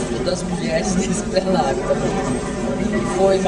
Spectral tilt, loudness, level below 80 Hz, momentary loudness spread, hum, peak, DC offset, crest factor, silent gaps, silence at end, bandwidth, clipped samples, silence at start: -5 dB/octave; -20 LUFS; -34 dBFS; 5 LU; none; -4 dBFS; under 0.1%; 16 dB; none; 0 s; 11 kHz; under 0.1%; 0 s